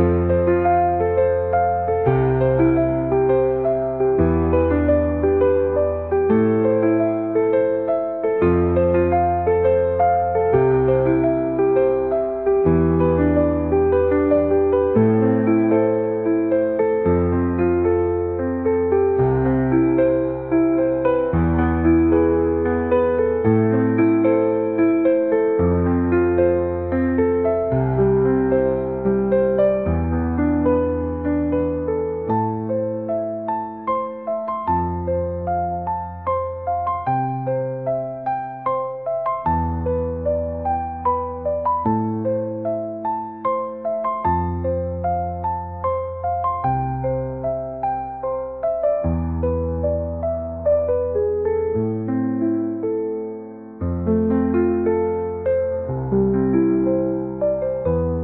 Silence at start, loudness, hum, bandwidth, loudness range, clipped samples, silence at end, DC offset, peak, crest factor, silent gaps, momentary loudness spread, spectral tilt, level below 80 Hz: 0 s; -20 LUFS; none; 3.9 kHz; 6 LU; under 0.1%; 0 s; 0.2%; -4 dBFS; 14 dB; none; 7 LU; -9.5 dB/octave; -40 dBFS